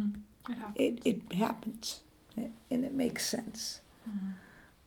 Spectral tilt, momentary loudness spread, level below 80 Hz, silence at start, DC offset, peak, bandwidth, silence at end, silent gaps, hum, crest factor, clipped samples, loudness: -4.5 dB/octave; 12 LU; -66 dBFS; 0 s; under 0.1%; -16 dBFS; over 20 kHz; 0.2 s; none; none; 20 dB; under 0.1%; -36 LUFS